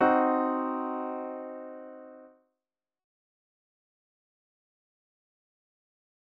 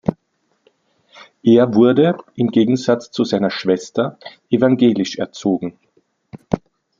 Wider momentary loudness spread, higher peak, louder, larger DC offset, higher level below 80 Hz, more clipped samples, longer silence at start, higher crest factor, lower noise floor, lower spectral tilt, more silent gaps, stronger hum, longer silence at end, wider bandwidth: first, 22 LU vs 12 LU; second, -12 dBFS vs -2 dBFS; second, -30 LUFS vs -17 LUFS; neither; second, -80 dBFS vs -52 dBFS; neither; about the same, 0 s vs 0.05 s; first, 22 dB vs 16 dB; first, under -90 dBFS vs -67 dBFS; second, -4 dB/octave vs -6.5 dB/octave; neither; neither; first, 4 s vs 0.4 s; second, 5 kHz vs 7.6 kHz